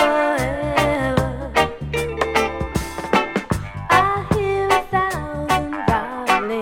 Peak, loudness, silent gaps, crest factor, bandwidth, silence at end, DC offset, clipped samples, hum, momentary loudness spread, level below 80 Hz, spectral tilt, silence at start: -2 dBFS; -20 LUFS; none; 18 dB; 18 kHz; 0 s; under 0.1%; under 0.1%; none; 7 LU; -36 dBFS; -5 dB/octave; 0 s